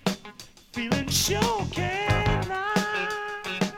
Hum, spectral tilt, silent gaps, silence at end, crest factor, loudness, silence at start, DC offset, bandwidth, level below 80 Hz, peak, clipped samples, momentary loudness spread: none; -4 dB/octave; none; 0 s; 20 dB; -26 LUFS; 0.05 s; under 0.1%; 17 kHz; -40 dBFS; -8 dBFS; under 0.1%; 13 LU